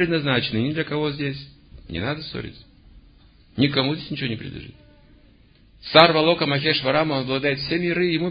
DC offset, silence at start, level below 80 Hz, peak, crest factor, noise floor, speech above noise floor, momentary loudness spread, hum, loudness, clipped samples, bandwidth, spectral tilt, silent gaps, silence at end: under 0.1%; 0 s; -50 dBFS; 0 dBFS; 22 dB; -53 dBFS; 32 dB; 18 LU; none; -21 LUFS; under 0.1%; 7.2 kHz; -8 dB/octave; none; 0 s